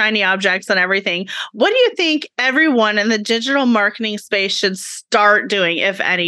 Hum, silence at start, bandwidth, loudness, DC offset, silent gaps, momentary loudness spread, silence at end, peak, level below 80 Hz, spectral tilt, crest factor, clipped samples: none; 0 s; 12.5 kHz; -15 LUFS; under 0.1%; none; 6 LU; 0 s; 0 dBFS; -82 dBFS; -3 dB/octave; 16 dB; under 0.1%